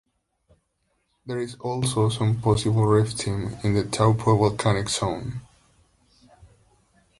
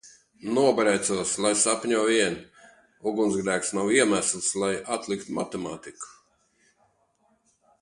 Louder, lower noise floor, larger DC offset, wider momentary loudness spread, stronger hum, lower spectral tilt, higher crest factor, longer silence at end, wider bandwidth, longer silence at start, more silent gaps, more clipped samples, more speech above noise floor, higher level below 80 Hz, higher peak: about the same, -23 LUFS vs -25 LUFS; first, -72 dBFS vs -68 dBFS; neither; second, 12 LU vs 16 LU; neither; first, -6 dB/octave vs -3 dB/octave; about the same, 20 dB vs 20 dB; about the same, 1.8 s vs 1.7 s; about the same, 11.5 kHz vs 11.5 kHz; first, 1.25 s vs 0.05 s; neither; neither; first, 50 dB vs 43 dB; first, -48 dBFS vs -64 dBFS; about the same, -6 dBFS vs -6 dBFS